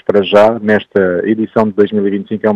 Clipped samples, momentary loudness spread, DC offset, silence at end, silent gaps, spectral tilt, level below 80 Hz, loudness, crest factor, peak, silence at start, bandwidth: 0.4%; 6 LU; under 0.1%; 0 s; none; -7.5 dB/octave; -52 dBFS; -12 LUFS; 12 dB; 0 dBFS; 0.1 s; 8.2 kHz